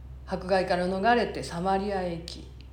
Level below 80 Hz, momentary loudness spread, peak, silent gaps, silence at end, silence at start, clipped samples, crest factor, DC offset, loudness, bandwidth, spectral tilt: -46 dBFS; 13 LU; -10 dBFS; none; 0 s; 0 s; under 0.1%; 18 dB; under 0.1%; -28 LUFS; 17 kHz; -5.5 dB/octave